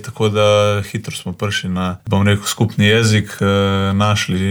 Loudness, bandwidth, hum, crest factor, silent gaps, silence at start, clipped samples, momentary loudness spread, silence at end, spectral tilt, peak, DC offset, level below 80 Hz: -16 LUFS; 19.5 kHz; none; 12 dB; none; 0 s; under 0.1%; 9 LU; 0 s; -5 dB/octave; -4 dBFS; under 0.1%; -48 dBFS